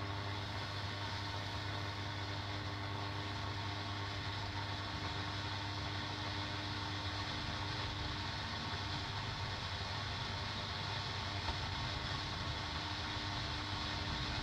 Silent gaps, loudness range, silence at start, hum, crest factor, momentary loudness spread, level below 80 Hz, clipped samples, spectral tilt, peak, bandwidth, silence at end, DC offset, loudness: none; 2 LU; 0 s; none; 16 dB; 2 LU; -54 dBFS; under 0.1%; -4.5 dB/octave; -24 dBFS; 12.5 kHz; 0 s; under 0.1%; -40 LUFS